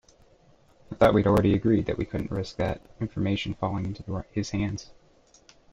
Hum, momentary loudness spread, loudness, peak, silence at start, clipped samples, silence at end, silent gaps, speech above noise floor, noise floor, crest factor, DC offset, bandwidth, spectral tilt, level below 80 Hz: none; 13 LU; -27 LUFS; -6 dBFS; 0.9 s; under 0.1%; 0.8 s; none; 33 dB; -59 dBFS; 20 dB; under 0.1%; 15 kHz; -7 dB/octave; -46 dBFS